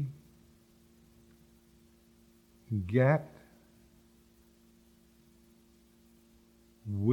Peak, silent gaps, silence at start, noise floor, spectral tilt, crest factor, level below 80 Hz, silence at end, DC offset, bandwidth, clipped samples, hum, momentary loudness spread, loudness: -12 dBFS; none; 0 s; -63 dBFS; -9.5 dB/octave; 24 dB; -66 dBFS; 0 s; under 0.1%; 17.5 kHz; under 0.1%; none; 27 LU; -31 LUFS